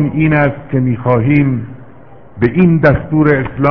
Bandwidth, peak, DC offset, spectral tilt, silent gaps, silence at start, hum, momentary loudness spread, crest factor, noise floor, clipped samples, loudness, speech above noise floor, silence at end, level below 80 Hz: 5.4 kHz; 0 dBFS; 1%; -11 dB/octave; none; 0 s; none; 7 LU; 12 dB; -39 dBFS; 0.2%; -12 LUFS; 28 dB; 0 s; -36 dBFS